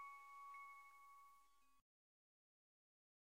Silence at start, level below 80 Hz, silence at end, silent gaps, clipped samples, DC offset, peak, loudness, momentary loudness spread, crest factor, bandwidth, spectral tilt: 0 s; under -90 dBFS; 1.5 s; none; under 0.1%; under 0.1%; -48 dBFS; -60 LUFS; 8 LU; 16 dB; 16 kHz; 0 dB/octave